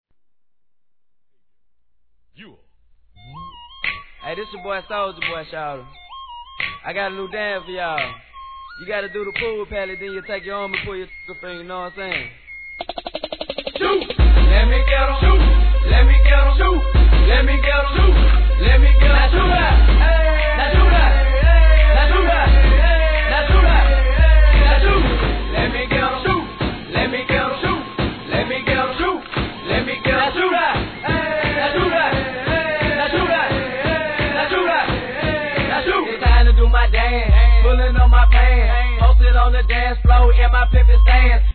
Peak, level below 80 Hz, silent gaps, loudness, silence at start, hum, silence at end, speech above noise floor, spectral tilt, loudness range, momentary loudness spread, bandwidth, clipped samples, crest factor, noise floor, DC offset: -2 dBFS; -16 dBFS; none; -16 LUFS; 3.35 s; none; 0.05 s; 66 dB; -9 dB/octave; 13 LU; 15 LU; 4.5 kHz; under 0.1%; 14 dB; -81 dBFS; 0.2%